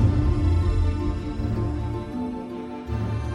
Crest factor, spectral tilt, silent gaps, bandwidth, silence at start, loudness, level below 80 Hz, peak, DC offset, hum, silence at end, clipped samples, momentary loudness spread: 14 dB; -8.5 dB/octave; none; 9.8 kHz; 0 s; -26 LUFS; -28 dBFS; -10 dBFS; under 0.1%; none; 0 s; under 0.1%; 9 LU